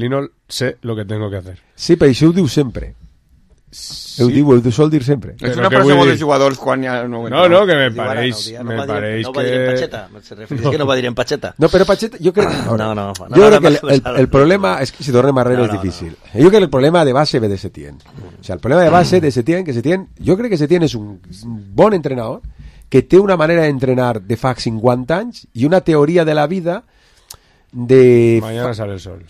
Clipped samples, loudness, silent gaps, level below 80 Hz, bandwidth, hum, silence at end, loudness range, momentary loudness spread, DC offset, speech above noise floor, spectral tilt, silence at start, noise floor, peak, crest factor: under 0.1%; -14 LUFS; none; -40 dBFS; 14 kHz; none; 0.05 s; 5 LU; 15 LU; under 0.1%; 37 dB; -6.5 dB/octave; 0 s; -50 dBFS; 0 dBFS; 14 dB